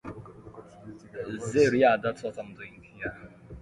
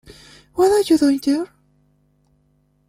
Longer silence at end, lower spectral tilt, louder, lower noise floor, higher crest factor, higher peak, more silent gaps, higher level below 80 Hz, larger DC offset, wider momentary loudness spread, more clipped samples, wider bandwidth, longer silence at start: second, 0 s vs 1.45 s; first, -5.5 dB/octave vs -4 dB/octave; second, -27 LUFS vs -17 LUFS; second, -48 dBFS vs -62 dBFS; about the same, 20 dB vs 16 dB; second, -10 dBFS vs -6 dBFS; neither; about the same, -58 dBFS vs -54 dBFS; neither; first, 25 LU vs 15 LU; neither; second, 11.5 kHz vs 15.5 kHz; second, 0.05 s vs 0.55 s